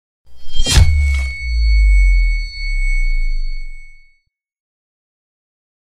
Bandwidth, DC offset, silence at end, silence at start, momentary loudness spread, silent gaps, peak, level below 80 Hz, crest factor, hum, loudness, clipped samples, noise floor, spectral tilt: 12.5 kHz; under 0.1%; 1.25 s; 0.25 s; 16 LU; none; 0 dBFS; -16 dBFS; 16 dB; none; -17 LUFS; under 0.1%; -60 dBFS; -3.5 dB/octave